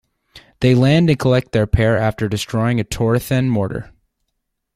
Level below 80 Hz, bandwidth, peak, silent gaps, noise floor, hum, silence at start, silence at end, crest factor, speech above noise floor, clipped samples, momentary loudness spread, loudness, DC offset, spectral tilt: -34 dBFS; 15.5 kHz; -2 dBFS; none; -74 dBFS; none; 0.35 s; 0.9 s; 16 dB; 58 dB; under 0.1%; 7 LU; -17 LUFS; under 0.1%; -7 dB/octave